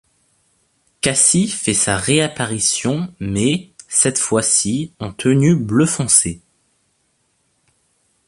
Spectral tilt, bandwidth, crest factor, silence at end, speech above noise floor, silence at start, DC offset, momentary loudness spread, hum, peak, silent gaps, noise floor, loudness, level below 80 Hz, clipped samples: -3.5 dB/octave; 11.5 kHz; 18 dB; 1.9 s; 48 dB; 1.05 s; under 0.1%; 10 LU; none; 0 dBFS; none; -65 dBFS; -16 LUFS; -48 dBFS; under 0.1%